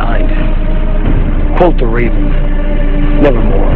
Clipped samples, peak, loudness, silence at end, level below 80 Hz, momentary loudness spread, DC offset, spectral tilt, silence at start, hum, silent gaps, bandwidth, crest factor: 0.3%; 0 dBFS; -13 LUFS; 0 s; -10 dBFS; 6 LU; under 0.1%; -10 dB/octave; 0 s; none; none; 4 kHz; 8 dB